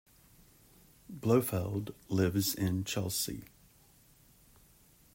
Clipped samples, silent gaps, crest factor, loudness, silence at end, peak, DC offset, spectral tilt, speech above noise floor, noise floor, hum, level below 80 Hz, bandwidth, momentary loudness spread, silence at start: under 0.1%; none; 22 dB; -33 LUFS; 1.7 s; -14 dBFS; under 0.1%; -5 dB/octave; 31 dB; -63 dBFS; none; -62 dBFS; 16.5 kHz; 9 LU; 1.1 s